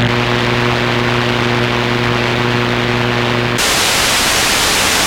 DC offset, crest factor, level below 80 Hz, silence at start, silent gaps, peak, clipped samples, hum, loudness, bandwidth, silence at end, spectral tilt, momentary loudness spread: under 0.1%; 14 dB; -34 dBFS; 0 s; none; 0 dBFS; under 0.1%; 60 Hz at -20 dBFS; -13 LUFS; 16.5 kHz; 0 s; -3 dB/octave; 3 LU